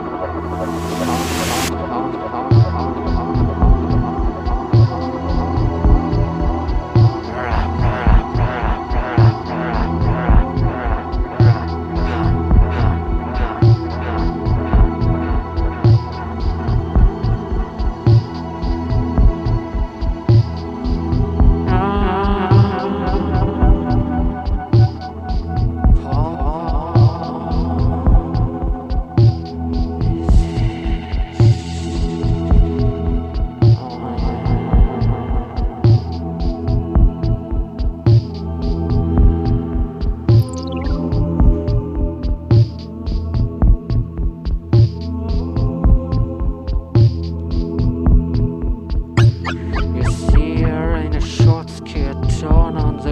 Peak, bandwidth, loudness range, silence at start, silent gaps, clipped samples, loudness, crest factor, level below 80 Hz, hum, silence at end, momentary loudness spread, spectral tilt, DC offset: 0 dBFS; 12.5 kHz; 2 LU; 0 s; none; under 0.1%; -18 LUFS; 16 dB; -20 dBFS; none; 0 s; 8 LU; -8 dB/octave; under 0.1%